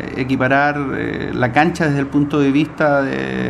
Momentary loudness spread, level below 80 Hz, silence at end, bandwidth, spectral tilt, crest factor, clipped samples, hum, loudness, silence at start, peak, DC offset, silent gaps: 6 LU; -42 dBFS; 0 s; 11.5 kHz; -7 dB/octave; 16 dB; under 0.1%; none; -17 LUFS; 0 s; 0 dBFS; under 0.1%; none